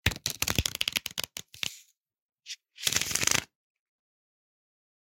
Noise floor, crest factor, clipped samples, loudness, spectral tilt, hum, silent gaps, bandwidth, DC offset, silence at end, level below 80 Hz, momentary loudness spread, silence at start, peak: -57 dBFS; 32 dB; under 0.1%; -29 LUFS; -1 dB/octave; none; 2.22-2.29 s; 17 kHz; under 0.1%; 1.7 s; -50 dBFS; 14 LU; 0.05 s; -4 dBFS